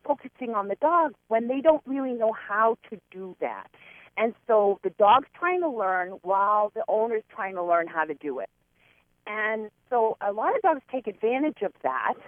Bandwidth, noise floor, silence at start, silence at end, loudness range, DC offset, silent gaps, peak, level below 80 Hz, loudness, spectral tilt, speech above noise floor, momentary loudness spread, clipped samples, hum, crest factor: 3.7 kHz; -64 dBFS; 0.05 s; 0 s; 5 LU; under 0.1%; none; -8 dBFS; -72 dBFS; -26 LUFS; -7.5 dB/octave; 38 dB; 11 LU; under 0.1%; none; 18 dB